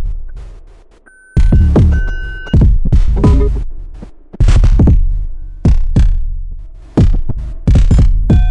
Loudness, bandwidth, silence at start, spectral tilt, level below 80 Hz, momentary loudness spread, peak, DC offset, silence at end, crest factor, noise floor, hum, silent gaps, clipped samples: -13 LUFS; 8.2 kHz; 0 s; -8.5 dB/octave; -12 dBFS; 18 LU; 0 dBFS; under 0.1%; 0 s; 10 dB; -42 dBFS; none; none; under 0.1%